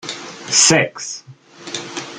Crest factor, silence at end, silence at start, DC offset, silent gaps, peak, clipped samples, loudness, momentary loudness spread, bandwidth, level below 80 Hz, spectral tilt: 20 dB; 0 s; 0.05 s; under 0.1%; none; 0 dBFS; under 0.1%; -14 LUFS; 20 LU; 14 kHz; -60 dBFS; -1.5 dB/octave